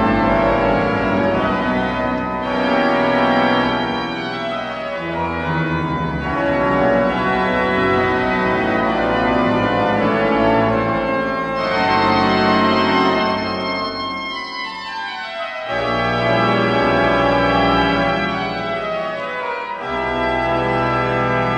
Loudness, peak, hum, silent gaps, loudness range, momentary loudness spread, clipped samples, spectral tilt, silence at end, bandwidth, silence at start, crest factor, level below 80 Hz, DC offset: -18 LUFS; -2 dBFS; none; none; 4 LU; 8 LU; under 0.1%; -6.5 dB/octave; 0 s; 10 kHz; 0 s; 14 dB; -38 dBFS; under 0.1%